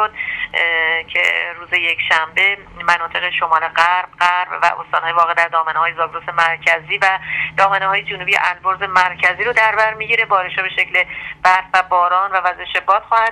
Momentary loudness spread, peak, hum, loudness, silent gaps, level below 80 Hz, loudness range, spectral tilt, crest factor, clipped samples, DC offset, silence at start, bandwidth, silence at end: 5 LU; 0 dBFS; none; -15 LUFS; none; -52 dBFS; 1 LU; -2 dB/octave; 16 dB; under 0.1%; under 0.1%; 0 s; 13 kHz; 0 s